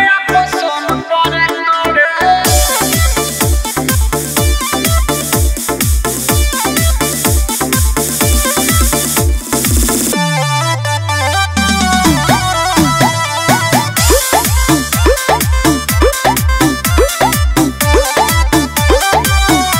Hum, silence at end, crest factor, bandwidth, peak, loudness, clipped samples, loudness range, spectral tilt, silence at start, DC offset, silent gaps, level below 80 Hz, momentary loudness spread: none; 0 s; 12 dB; 16.5 kHz; 0 dBFS; -11 LUFS; under 0.1%; 2 LU; -3.5 dB/octave; 0 s; under 0.1%; none; -18 dBFS; 3 LU